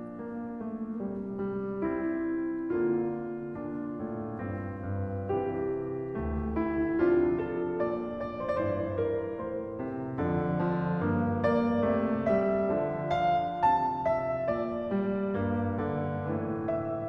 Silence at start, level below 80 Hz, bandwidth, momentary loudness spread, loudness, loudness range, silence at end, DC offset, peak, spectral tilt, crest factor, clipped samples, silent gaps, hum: 0 s; -52 dBFS; 5.8 kHz; 9 LU; -31 LUFS; 5 LU; 0 s; under 0.1%; -14 dBFS; -10 dB/octave; 16 dB; under 0.1%; none; none